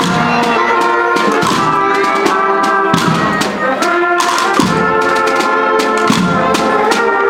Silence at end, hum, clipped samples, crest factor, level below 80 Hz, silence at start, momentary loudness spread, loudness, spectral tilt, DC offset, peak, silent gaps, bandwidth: 0 s; none; under 0.1%; 12 dB; -46 dBFS; 0 s; 1 LU; -12 LUFS; -4.5 dB/octave; under 0.1%; 0 dBFS; none; 17.5 kHz